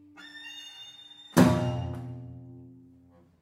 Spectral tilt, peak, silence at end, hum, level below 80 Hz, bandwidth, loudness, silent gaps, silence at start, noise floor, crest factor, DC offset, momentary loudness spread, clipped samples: -6 dB/octave; -6 dBFS; 0.75 s; none; -54 dBFS; 16 kHz; -26 LUFS; none; 0.2 s; -58 dBFS; 24 dB; under 0.1%; 25 LU; under 0.1%